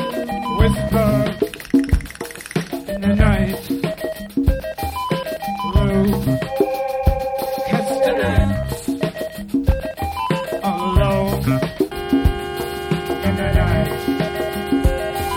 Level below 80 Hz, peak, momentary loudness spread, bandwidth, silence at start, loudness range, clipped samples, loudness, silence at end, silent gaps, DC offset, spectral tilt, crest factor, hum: -26 dBFS; 0 dBFS; 8 LU; 17 kHz; 0 s; 2 LU; under 0.1%; -20 LUFS; 0 s; none; under 0.1%; -6.5 dB/octave; 18 dB; none